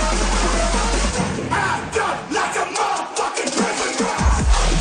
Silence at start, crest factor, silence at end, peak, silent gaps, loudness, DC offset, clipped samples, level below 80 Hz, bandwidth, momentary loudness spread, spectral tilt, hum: 0 s; 14 dB; 0 s; -4 dBFS; none; -20 LUFS; under 0.1%; under 0.1%; -24 dBFS; 10 kHz; 3 LU; -3.5 dB/octave; none